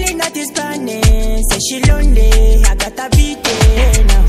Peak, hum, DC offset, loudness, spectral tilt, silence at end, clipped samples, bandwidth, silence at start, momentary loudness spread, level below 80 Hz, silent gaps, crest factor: 0 dBFS; none; under 0.1%; -13 LUFS; -4 dB/octave; 0 s; under 0.1%; 15 kHz; 0 s; 7 LU; -10 dBFS; none; 10 dB